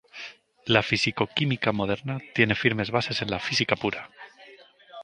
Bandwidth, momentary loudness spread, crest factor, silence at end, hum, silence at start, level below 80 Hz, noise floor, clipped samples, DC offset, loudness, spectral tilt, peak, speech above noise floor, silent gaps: 10 kHz; 18 LU; 24 dB; 0 s; none; 0.15 s; -56 dBFS; -52 dBFS; under 0.1%; under 0.1%; -25 LUFS; -5 dB/octave; -2 dBFS; 26 dB; none